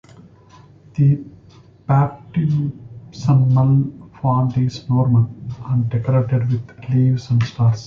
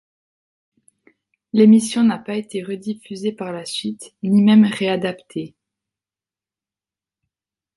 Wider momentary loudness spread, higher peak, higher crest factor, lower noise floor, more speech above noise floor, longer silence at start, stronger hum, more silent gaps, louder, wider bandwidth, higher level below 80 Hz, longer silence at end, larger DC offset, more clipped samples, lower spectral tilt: second, 11 LU vs 17 LU; about the same, -4 dBFS vs -2 dBFS; about the same, 14 dB vs 18 dB; second, -46 dBFS vs under -90 dBFS; second, 30 dB vs over 73 dB; second, 0.95 s vs 1.55 s; neither; neither; about the same, -18 LUFS vs -18 LUFS; second, 7 kHz vs 11.5 kHz; first, -46 dBFS vs -66 dBFS; second, 0 s vs 2.3 s; neither; neither; first, -9 dB/octave vs -6 dB/octave